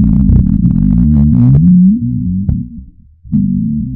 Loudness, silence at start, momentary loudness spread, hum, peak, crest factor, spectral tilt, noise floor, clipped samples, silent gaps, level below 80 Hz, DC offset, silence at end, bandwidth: -10 LUFS; 0 s; 10 LU; none; 0 dBFS; 10 dB; -14 dB/octave; -35 dBFS; under 0.1%; none; -18 dBFS; under 0.1%; 0 s; 1.7 kHz